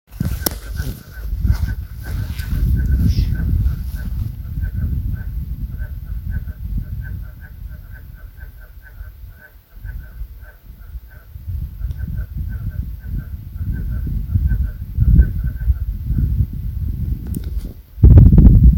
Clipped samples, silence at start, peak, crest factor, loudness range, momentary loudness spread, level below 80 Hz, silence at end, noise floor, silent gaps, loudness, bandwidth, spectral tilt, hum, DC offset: 0.3%; 0.1 s; 0 dBFS; 18 dB; 16 LU; 22 LU; -20 dBFS; 0 s; -41 dBFS; none; -20 LUFS; 17 kHz; -7.5 dB/octave; none; under 0.1%